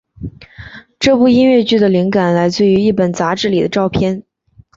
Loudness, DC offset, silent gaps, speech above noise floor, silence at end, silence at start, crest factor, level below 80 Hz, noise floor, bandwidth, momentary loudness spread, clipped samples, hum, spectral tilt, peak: -13 LUFS; under 0.1%; none; 36 dB; 0.55 s; 0.2 s; 12 dB; -42 dBFS; -48 dBFS; 7.8 kHz; 20 LU; under 0.1%; none; -6 dB/octave; -2 dBFS